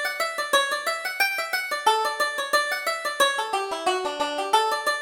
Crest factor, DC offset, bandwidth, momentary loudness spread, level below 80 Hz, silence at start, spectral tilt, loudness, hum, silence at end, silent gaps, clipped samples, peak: 18 dB; under 0.1%; over 20 kHz; 5 LU; -68 dBFS; 0 s; 0.5 dB/octave; -24 LUFS; none; 0 s; none; under 0.1%; -6 dBFS